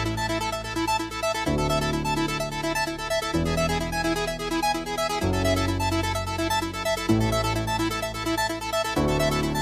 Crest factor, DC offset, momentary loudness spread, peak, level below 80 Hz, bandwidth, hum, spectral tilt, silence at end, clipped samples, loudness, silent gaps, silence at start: 16 dB; under 0.1%; 4 LU; -8 dBFS; -38 dBFS; 15.5 kHz; none; -4.5 dB/octave; 0 s; under 0.1%; -25 LUFS; none; 0 s